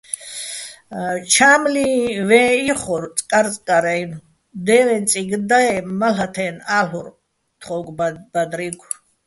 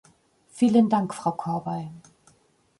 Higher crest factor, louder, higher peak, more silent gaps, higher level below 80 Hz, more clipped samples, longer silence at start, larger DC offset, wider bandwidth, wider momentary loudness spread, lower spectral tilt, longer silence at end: about the same, 18 dB vs 18 dB; first, -18 LUFS vs -24 LUFS; first, 0 dBFS vs -8 dBFS; neither; first, -56 dBFS vs -68 dBFS; neither; second, 0.1 s vs 0.55 s; neither; about the same, 12 kHz vs 11.5 kHz; about the same, 15 LU vs 14 LU; second, -3 dB/octave vs -7 dB/octave; second, 0.5 s vs 0.8 s